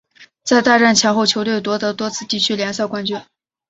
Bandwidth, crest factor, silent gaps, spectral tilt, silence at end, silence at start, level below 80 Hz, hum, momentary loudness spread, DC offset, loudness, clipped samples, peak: 8 kHz; 16 dB; none; -3 dB/octave; 0.5 s; 0.2 s; -60 dBFS; none; 12 LU; under 0.1%; -16 LUFS; under 0.1%; 0 dBFS